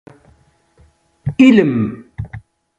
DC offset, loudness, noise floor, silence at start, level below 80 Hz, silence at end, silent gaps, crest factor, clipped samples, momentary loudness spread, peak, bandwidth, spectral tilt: under 0.1%; -13 LUFS; -54 dBFS; 1.25 s; -44 dBFS; 0.4 s; none; 16 dB; under 0.1%; 21 LU; 0 dBFS; 7.8 kHz; -7.5 dB/octave